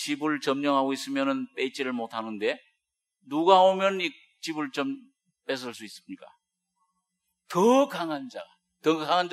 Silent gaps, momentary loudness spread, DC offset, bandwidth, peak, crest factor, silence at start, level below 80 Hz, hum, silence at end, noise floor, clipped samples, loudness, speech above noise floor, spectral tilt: none; 20 LU; under 0.1%; 14 kHz; -6 dBFS; 22 dB; 0 s; -88 dBFS; none; 0 s; -82 dBFS; under 0.1%; -26 LUFS; 55 dB; -4.5 dB/octave